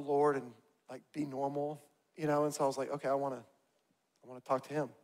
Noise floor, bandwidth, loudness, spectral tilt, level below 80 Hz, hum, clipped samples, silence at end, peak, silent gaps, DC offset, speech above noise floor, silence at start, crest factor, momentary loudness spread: -78 dBFS; 16 kHz; -36 LUFS; -6 dB/octave; -82 dBFS; none; under 0.1%; 0.1 s; -18 dBFS; none; under 0.1%; 41 dB; 0 s; 18 dB; 21 LU